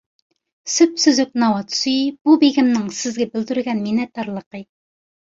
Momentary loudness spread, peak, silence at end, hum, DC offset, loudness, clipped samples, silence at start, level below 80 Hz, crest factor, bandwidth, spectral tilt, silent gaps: 14 LU; -2 dBFS; 0.7 s; none; under 0.1%; -18 LUFS; under 0.1%; 0.65 s; -64 dBFS; 16 dB; 7.8 kHz; -3.5 dB/octave; 2.21-2.25 s, 4.46-4.51 s